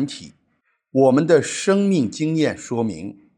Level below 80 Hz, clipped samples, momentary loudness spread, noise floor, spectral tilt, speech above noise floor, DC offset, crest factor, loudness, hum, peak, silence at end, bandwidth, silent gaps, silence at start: -64 dBFS; under 0.1%; 11 LU; -68 dBFS; -5.5 dB/octave; 49 dB; under 0.1%; 18 dB; -19 LUFS; none; -2 dBFS; 0.25 s; 10.5 kHz; none; 0 s